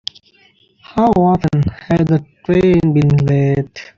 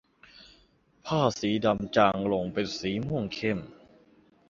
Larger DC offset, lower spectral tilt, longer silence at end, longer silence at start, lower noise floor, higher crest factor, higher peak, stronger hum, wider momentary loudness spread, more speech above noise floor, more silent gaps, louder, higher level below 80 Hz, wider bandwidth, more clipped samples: neither; first, -8.5 dB/octave vs -6 dB/octave; second, 0.15 s vs 0.75 s; first, 0.9 s vs 0.4 s; second, -53 dBFS vs -63 dBFS; second, 14 dB vs 22 dB; first, 0 dBFS vs -6 dBFS; neither; about the same, 6 LU vs 8 LU; about the same, 39 dB vs 36 dB; neither; first, -14 LUFS vs -28 LUFS; first, -40 dBFS vs -58 dBFS; about the same, 7.2 kHz vs 7.6 kHz; neither